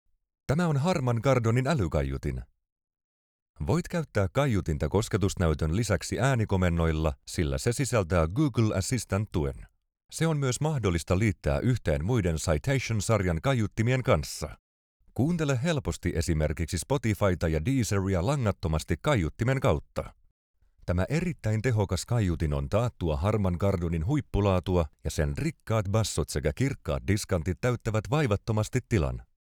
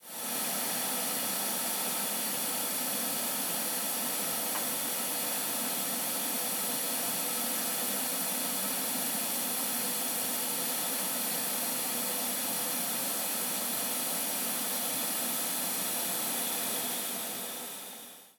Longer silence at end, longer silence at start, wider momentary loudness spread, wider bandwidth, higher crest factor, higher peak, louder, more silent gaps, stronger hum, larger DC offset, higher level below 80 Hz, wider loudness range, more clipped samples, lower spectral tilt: first, 0.25 s vs 0.1 s; first, 0.5 s vs 0 s; first, 5 LU vs 1 LU; second, 17 kHz vs 19.5 kHz; about the same, 18 dB vs 14 dB; first, -10 dBFS vs -18 dBFS; about the same, -28 LUFS vs -30 LUFS; first, 2.72-2.76 s, 3.04-3.54 s, 10.05-10.09 s, 14.59-15.00 s, 20.31-20.54 s vs none; neither; neither; first, -42 dBFS vs -82 dBFS; about the same, 2 LU vs 0 LU; neither; first, -6 dB/octave vs -0.5 dB/octave